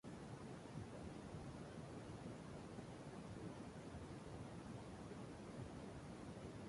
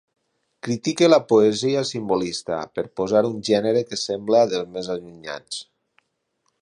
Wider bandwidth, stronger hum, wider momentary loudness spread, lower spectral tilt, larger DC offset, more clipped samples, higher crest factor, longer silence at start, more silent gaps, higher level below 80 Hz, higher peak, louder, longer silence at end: about the same, 11.5 kHz vs 11 kHz; neither; second, 1 LU vs 15 LU; first, -6.5 dB/octave vs -5 dB/octave; neither; neither; second, 14 dB vs 20 dB; second, 0.05 s vs 0.65 s; neither; about the same, -66 dBFS vs -62 dBFS; second, -40 dBFS vs -2 dBFS; second, -54 LUFS vs -21 LUFS; second, 0 s vs 1 s